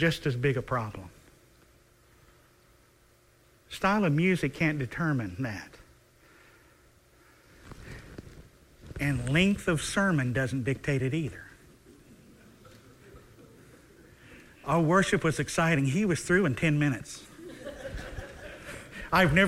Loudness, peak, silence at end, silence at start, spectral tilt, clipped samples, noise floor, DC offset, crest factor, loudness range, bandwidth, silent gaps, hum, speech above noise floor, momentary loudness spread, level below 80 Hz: -28 LUFS; -8 dBFS; 0 s; 0 s; -5.5 dB/octave; under 0.1%; -62 dBFS; under 0.1%; 22 dB; 12 LU; 15.5 kHz; none; none; 35 dB; 21 LU; -52 dBFS